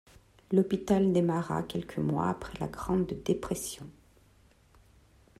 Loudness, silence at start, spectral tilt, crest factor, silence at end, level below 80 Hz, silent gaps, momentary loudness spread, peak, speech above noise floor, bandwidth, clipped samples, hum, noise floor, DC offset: -30 LUFS; 0.5 s; -6.5 dB/octave; 20 dB; 1.5 s; -54 dBFS; none; 11 LU; -12 dBFS; 32 dB; 15 kHz; under 0.1%; none; -62 dBFS; under 0.1%